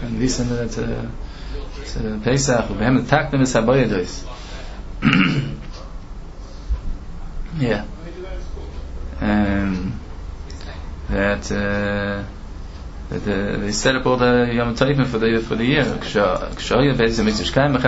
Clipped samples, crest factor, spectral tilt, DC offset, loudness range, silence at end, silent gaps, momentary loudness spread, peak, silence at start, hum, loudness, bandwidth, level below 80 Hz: under 0.1%; 20 dB; -5.5 dB/octave; under 0.1%; 7 LU; 0 s; none; 19 LU; 0 dBFS; 0 s; none; -20 LUFS; 8 kHz; -30 dBFS